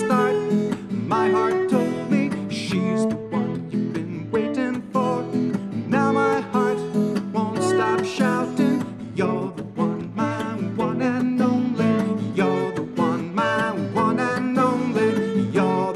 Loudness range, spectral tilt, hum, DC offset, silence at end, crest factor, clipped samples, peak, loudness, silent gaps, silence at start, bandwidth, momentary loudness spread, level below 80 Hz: 2 LU; -6.5 dB/octave; none; under 0.1%; 0 s; 14 dB; under 0.1%; -8 dBFS; -22 LUFS; none; 0 s; 12.5 kHz; 6 LU; -62 dBFS